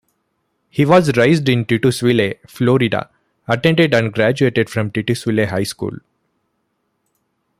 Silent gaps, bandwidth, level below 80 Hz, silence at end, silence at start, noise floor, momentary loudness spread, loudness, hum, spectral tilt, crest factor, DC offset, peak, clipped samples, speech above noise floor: none; 15.5 kHz; -52 dBFS; 1.65 s; 0.75 s; -69 dBFS; 11 LU; -16 LUFS; none; -6 dB/octave; 16 dB; under 0.1%; 0 dBFS; under 0.1%; 54 dB